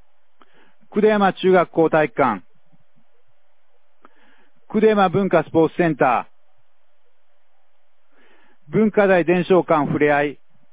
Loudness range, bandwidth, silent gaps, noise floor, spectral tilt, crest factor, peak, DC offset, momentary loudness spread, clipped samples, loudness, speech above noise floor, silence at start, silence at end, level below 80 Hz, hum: 5 LU; 4 kHz; none; -68 dBFS; -10.5 dB/octave; 18 dB; -2 dBFS; 0.7%; 8 LU; under 0.1%; -18 LUFS; 52 dB; 0.95 s; 0.4 s; -58 dBFS; none